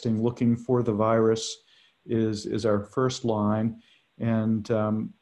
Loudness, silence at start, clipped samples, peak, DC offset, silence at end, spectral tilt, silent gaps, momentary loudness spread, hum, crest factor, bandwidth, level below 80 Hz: -26 LUFS; 0 s; under 0.1%; -10 dBFS; under 0.1%; 0.1 s; -6.5 dB/octave; none; 7 LU; none; 16 dB; 10 kHz; -56 dBFS